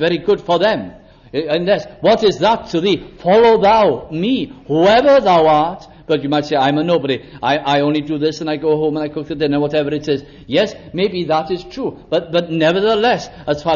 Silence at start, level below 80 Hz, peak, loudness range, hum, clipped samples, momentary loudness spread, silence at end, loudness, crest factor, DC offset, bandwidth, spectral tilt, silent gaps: 0 s; -46 dBFS; -2 dBFS; 5 LU; none; under 0.1%; 11 LU; 0 s; -16 LUFS; 12 dB; under 0.1%; 7.2 kHz; -6 dB/octave; none